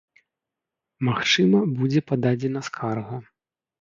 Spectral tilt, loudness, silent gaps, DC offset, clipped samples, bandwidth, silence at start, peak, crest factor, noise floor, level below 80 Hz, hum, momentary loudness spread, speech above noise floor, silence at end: -5.5 dB/octave; -23 LUFS; none; under 0.1%; under 0.1%; 7.6 kHz; 1 s; -8 dBFS; 18 dB; -86 dBFS; -64 dBFS; none; 12 LU; 64 dB; 0.6 s